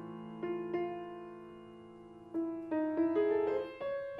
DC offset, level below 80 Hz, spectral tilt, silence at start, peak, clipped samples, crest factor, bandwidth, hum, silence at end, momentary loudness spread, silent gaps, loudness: under 0.1%; -74 dBFS; -8.5 dB/octave; 0 s; -20 dBFS; under 0.1%; 16 dB; 5.2 kHz; none; 0 s; 21 LU; none; -36 LUFS